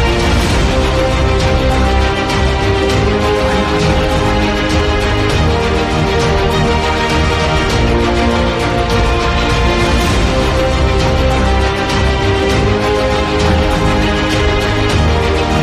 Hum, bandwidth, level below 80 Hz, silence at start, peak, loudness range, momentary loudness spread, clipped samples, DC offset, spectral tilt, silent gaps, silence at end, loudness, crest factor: none; 14 kHz; -18 dBFS; 0 s; 0 dBFS; 0 LU; 1 LU; under 0.1%; 0.2%; -5.5 dB/octave; none; 0 s; -13 LUFS; 12 dB